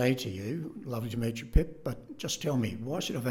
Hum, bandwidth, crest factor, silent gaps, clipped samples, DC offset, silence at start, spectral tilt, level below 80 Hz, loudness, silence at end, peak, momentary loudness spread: none; 17.5 kHz; 22 dB; none; under 0.1%; under 0.1%; 0 s; -5.5 dB/octave; -38 dBFS; -33 LUFS; 0 s; -10 dBFS; 8 LU